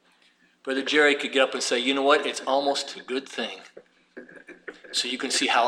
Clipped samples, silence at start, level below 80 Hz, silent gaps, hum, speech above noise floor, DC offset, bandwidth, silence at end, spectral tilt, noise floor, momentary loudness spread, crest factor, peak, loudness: under 0.1%; 0.65 s; -80 dBFS; none; none; 38 dB; under 0.1%; 15 kHz; 0 s; -1 dB/octave; -62 dBFS; 21 LU; 20 dB; -6 dBFS; -24 LUFS